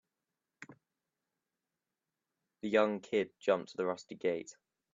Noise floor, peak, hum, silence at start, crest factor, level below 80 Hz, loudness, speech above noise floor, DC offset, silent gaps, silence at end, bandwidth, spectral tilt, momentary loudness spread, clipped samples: -90 dBFS; -14 dBFS; none; 0.6 s; 22 dB; -82 dBFS; -35 LUFS; 56 dB; under 0.1%; none; 0.4 s; 7.6 kHz; -5 dB/octave; 24 LU; under 0.1%